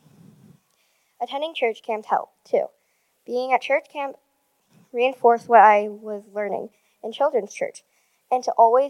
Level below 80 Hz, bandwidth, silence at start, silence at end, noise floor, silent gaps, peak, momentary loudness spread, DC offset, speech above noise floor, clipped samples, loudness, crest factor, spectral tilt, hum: -88 dBFS; 11.5 kHz; 1.2 s; 0 s; -67 dBFS; none; 0 dBFS; 18 LU; under 0.1%; 46 dB; under 0.1%; -22 LUFS; 22 dB; -4 dB/octave; none